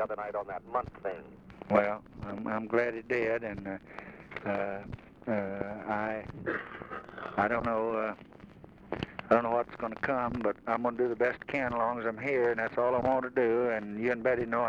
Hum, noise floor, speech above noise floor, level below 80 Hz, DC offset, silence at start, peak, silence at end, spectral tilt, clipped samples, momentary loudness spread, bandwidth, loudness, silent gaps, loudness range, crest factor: none; -52 dBFS; 21 dB; -60 dBFS; under 0.1%; 0 s; -12 dBFS; 0 s; -8 dB/octave; under 0.1%; 14 LU; 7.4 kHz; -32 LUFS; none; 6 LU; 20 dB